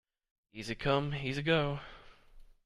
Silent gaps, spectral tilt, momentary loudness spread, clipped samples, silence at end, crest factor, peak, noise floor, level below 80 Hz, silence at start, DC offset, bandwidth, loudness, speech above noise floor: none; -6 dB/octave; 18 LU; under 0.1%; 0.2 s; 20 dB; -16 dBFS; -56 dBFS; -54 dBFS; 0.55 s; under 0.1%; 11.5 kHz; -33 LUFS; 23 dB